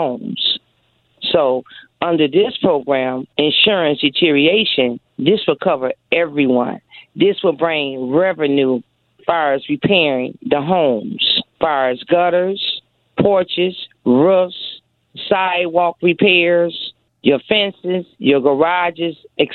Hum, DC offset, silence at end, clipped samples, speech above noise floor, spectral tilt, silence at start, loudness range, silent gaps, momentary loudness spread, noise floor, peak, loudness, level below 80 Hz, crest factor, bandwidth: none; under 0.1%; 0 s; under 0.1%; 45 dB; -8.5 dB/octave; 0 s; 3 LU; none; 10 LU; -60 dBFS; 0 dBFS; -16 LUFS; -58 dBFS; 16 dB; 4.5 kHz